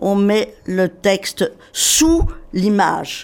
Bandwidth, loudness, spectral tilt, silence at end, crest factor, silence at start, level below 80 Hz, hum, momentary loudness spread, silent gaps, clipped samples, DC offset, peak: 17.5 kHz; -17 LUFS; -3.5 dB/octave; 0 s; 16 dB; 0 s; -30 dBFS; none; 9 LU; none; under 0.1%; under 0.1%; 0 dBFS